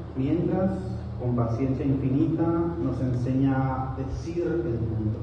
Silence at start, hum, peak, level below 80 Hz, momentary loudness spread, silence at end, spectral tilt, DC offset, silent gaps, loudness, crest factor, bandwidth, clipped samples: 0 s; none; -10 dBFS; -40 dBFS; 7 LU; 0 s; -10 dB/octave; under 0.1%; none; -27 LUFS; 14 dB; 7 kHz; under 0.1%